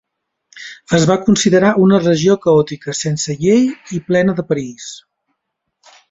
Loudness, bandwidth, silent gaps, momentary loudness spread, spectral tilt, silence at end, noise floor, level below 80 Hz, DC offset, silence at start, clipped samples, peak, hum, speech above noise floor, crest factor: -14 LUFS; 8.2 kHz; none; 18 LU; -5.5 dB/octave; 1.15 s; -74 dBFS; -52 dBFS; under 0.1%; 0.55 s; under 0.1%; 0 dBFS; none; 61 dB; 14 dB